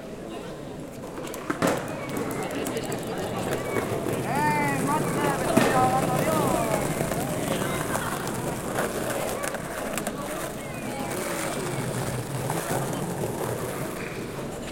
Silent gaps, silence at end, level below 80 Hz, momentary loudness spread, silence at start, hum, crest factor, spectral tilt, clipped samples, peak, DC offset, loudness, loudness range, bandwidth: none; 0 s; -50 dBFS; 10 LU; 0 s; none; 24 dB; -5 dB/octave; under 0.1%; -4 dBFS; under 0.1%; -28 LUFS; 6 LU; 17 kHz